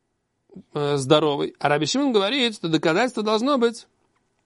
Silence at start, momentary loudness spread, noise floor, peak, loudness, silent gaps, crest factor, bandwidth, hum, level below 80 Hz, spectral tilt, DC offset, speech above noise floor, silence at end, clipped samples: 0.55 s; 6 LU; -69 dBFS; -2 dBFS; -21 LUFS; none; 20 dB; 11.5 kHz; none; -68 dBFS; -4.5 dB/octave; under 0.1%; 48 dB; 0.65 s; under 0.1%